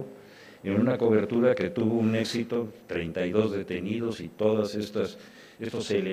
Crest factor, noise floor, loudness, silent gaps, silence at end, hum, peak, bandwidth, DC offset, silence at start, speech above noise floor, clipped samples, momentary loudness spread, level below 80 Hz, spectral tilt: 18 dB; -50 dBFS; -28 LUFS; none; 0 s; none; -10 dBFS; 15 kHz; under 0.1%; 0 s; 23 dB; under 0.1%; 10 LU; -62 dBFS; -6.5 dB/octave